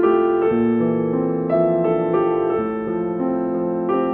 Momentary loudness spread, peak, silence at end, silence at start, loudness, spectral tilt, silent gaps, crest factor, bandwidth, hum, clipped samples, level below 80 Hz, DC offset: 5 LU; -6 dBFS; 0 s; 0 s; -20 LUFS; -11.5 dB/octave; none; 14 dB; 3.8 kHz; none; under 0.1%; -52 dBFS; under 0.1%